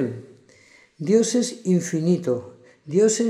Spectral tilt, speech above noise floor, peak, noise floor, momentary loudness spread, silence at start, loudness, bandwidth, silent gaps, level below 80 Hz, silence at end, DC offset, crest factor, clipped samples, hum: -5.5 dB/octave; 33 dB; -6 dBFS; -53 dBFS; 10 LU; 0 s; -22 LUFS; 13 kHz; none; -74 dBFS; 0 s; under 0.1%; 16 dB; under 0.1%; none